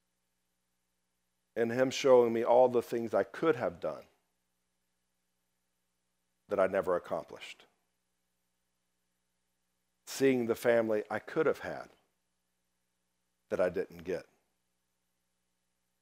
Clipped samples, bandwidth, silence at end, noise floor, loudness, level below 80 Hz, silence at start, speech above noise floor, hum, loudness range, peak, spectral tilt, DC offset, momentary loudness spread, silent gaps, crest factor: under 0.1%; 16 kHz; 1.8 s; -83 dBFS; -31 LUFS; -78 dBFS; 1.55 s; 53 dB; 60 Hz at -70 dBFS; 11 LU; -12 dBFS; -5 dB/octave; under 0.1%; 17 LU; none; 22 dB